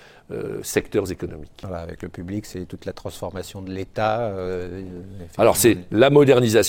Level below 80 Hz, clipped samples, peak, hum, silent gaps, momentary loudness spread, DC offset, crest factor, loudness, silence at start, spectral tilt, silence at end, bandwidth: -46 dBFS; under 0.1%; -2 dBFS; none; none; 19 LU; under 0.1%; 20 dB; -20 LUFS; 0.3 s; -5 dB/octave; 0 s; 17 kHz